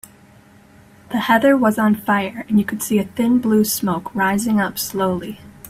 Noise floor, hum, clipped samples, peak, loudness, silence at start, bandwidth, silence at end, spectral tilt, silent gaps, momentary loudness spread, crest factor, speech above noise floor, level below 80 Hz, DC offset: -48 dBFS; none; under 0.1%; -2 dBFS; -18 LUFS; 1.1 s; 16 kHz; 0 s; -5 dB/octave; none; 7 LU; 18 dB; 30 dB; -54 dBFS; under 0.1%